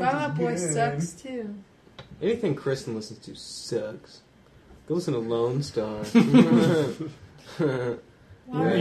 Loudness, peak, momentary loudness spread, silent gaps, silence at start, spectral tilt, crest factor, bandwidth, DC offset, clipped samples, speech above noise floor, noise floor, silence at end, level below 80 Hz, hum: -25 LUFS; -6 dBFS; 19 LU; none; 0 s; -6 dB/octave; 20 dB; 13 kHz; under 0.1%; under 0.1%; 28 dB; -53 dBFS; 0 s; -60 dBFS; none